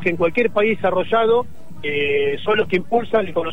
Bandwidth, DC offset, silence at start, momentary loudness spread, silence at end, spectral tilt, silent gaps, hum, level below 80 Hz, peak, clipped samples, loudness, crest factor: 8.2 kHz; 4%; 0 s; 4 LU; 0 s; -7 dB/octave; none; none; -50 dBFS; -6 dBFS; under 0.1%; -19 LUFS; 14 dB